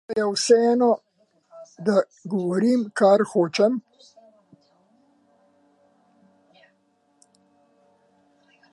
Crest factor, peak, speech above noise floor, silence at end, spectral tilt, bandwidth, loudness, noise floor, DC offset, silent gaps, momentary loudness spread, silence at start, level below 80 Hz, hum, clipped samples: 20 dB; -6 dBFS; 46 dB; 4.95 s; -5 dB/octave; 11.5 kHz; -21 LUFS; -66 dBFS; under 0.1%; none; 10 LU; 0.1 s; -78 dBFS; none; under 0.1%